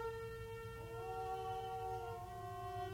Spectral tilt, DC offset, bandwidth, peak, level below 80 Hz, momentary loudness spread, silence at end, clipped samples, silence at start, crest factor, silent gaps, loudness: -5.5 dB/octave; under 0.1%; 17.5 kHz; -32 dBFS; -60 dBFS; 5 LU; 0 s; under 0.1%; 0 s; 14 dB; none; -46 LUFS